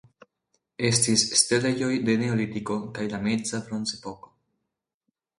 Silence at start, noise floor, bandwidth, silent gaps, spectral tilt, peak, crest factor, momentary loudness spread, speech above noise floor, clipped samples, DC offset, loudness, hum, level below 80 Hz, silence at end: 0.8 s; -83 dBFS; 11.5 kHz; none; -3.5 dB/octave; -6 dBFS; 20 dB; 11 LU; 58 dB; under 0.1%; under 0.1%; -24 LUFS; none; -60 dBFS; 1.25 s